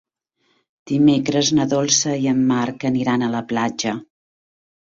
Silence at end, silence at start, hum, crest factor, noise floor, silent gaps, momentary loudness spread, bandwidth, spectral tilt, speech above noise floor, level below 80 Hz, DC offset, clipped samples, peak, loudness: 0.9 s; 0.85 s; none; 16 dB; -67 dBFS; none; 8 LU; 7.8 kHz; -4 dB/octave; 49 dB; -58 dBFS; under 0.1%; under 0.1%; -4 dBFS; -19 LUFS